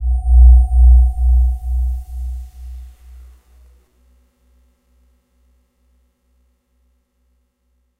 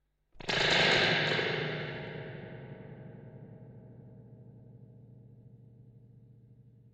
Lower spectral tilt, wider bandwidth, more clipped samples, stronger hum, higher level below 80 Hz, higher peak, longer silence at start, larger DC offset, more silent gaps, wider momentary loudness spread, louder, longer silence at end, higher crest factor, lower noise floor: first, -9 dB/octave vs -3.5 dB/octave; second, 0.8 kHz vs 9.6 kHz; neither; second, none vs 50 Hz at -65 dBFS; first, -16 dBFS vs -62 dBFS; first, 0 dBFS vs -14 dBFS; second, 0 s vs 0.35 s; neither; neither; second, 25 LU vs 28 LU; first, -14 LUFS vs -29 LUFS; first, 5.15 s vs 0.4 s; second, 16 dB vs 22 dB; first, -65 dBFS vs -58 dBFS